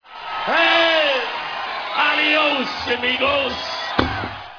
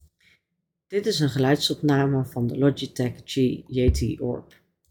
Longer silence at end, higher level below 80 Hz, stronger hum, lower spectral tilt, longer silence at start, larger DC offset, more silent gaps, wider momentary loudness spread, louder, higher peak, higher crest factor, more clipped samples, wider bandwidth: second, 0 s vs 0.5 s; about the same, -44 dBFS vs -40 dBFS; neither; second, -4 dB/octave vs -6 dB/octave; second, 0.05 s vs 0.9 s; neither; neither; first, 11 LU vs 8 LU; first, -18 LUFS vs -24 LUFS; first, 0 dBFS vs -8 dBFS; about the same, 20 dB vs 18 dB; neither; second, 5.4 kHz vs 18.5 kHz